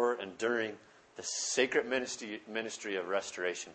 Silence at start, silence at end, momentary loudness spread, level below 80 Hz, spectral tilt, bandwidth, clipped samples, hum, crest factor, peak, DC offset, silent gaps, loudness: 0 s; 0 s; 11 LU; -80 dBFS; -1.5 dB/octave; 8.8 kHz; under 0.1%; none; 20 dB; -14 dBFS; under 0.1%; none; -35 LUFS